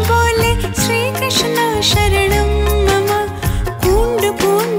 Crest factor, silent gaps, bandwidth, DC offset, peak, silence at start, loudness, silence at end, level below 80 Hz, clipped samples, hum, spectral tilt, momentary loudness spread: 12 dB; none; 16 kHz; under 0.1%; -2 dBFS; 0 s; -14 LUFS; 0 s; -22 dBFS; under 0.1%; none; -4 dB/octave; 5 LU